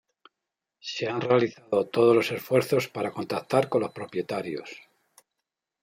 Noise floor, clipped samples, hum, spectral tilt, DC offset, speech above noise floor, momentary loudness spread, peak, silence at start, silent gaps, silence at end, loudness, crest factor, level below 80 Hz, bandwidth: -86 dBFS; under 0.1%; none; -6 dB/octave; under 0.1%; 61 dB; 14 LU; -8 dBFS; 0.85 s; none; 1.05 s; -26 LUFS; 20 dB; -72 dBFS; 16 kHz